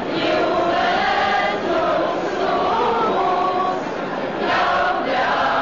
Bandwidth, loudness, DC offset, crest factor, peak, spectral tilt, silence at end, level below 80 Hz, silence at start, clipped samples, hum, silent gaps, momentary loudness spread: 7.4 kHz; -19 LUFS; 0.4%; 10 dB; -8 dBFS; -5 dB/octave; 0 s; -50 dBFS; 0 s; under 0.1%; none; none; 4 LU